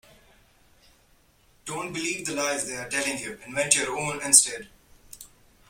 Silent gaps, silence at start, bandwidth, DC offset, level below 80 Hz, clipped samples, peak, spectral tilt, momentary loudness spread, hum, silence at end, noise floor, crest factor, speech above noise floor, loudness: none; 1.65 s; 16.5 kHz; under 0.1%; -62 dBFS; under 0.1%; 0 dBFS; -1 dB/octave; 24 LU; none; 0.45 s; -61 dBFS; 28 dB; 35 dB; -23 LUFS